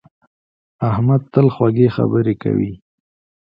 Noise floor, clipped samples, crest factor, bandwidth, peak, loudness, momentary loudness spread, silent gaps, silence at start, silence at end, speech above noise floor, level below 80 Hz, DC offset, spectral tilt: under -90 dBFS; under 0.1%; 16 dB; 5.4 kHz; 0 dBFS; -17 LUFS; 6 LU; none; 0.8 s; 0.7 s; over 75 dB; -48 dBFS; under 0.1%; -12 dB/octave